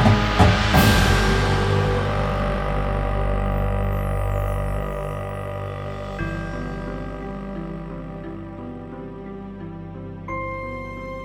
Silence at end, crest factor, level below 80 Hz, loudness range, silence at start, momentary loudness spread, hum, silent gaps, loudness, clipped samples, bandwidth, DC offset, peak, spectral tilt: 0 s; 20 dB; -28 dBFS; 13 LU; 0 s; 18 LU; 50 Hz at -45 dBFS; none; -23 LUFS; under 0.1%; 17 kHz; under 0.1%; -2 dBFS; -6 dB/octave